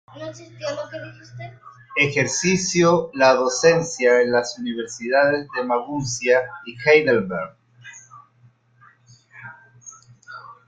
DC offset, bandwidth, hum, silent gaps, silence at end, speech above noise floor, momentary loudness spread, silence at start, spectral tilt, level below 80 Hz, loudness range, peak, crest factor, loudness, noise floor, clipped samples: under 0.1%; 9.4 kHz; none; none; 0.15 s; 36 dB; 23 LU; 0.15 s; -4 dB/octave; -60 dBFS; 5 LU; -2 dBFS; 20 dB; -19 LUFS; -56 dBFS; under 0.1%